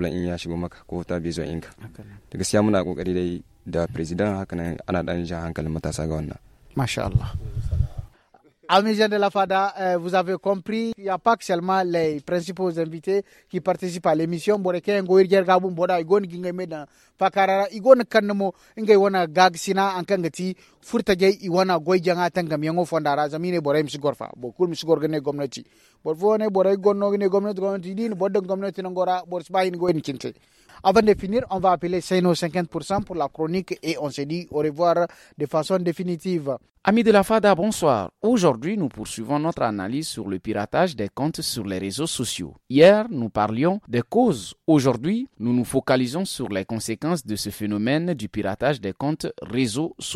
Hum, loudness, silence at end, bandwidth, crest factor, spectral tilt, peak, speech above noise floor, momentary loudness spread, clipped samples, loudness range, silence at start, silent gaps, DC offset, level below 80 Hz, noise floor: none; -23 LUFS; 0 s; 14.5 kHz; 20 dB; -5.5 dB/octave; -2 dBFS; 35 dB; 11 LU; under 0.1%; 5 LU; 0 s; none; under 0.1%; -44 dBFS; -58 dBFS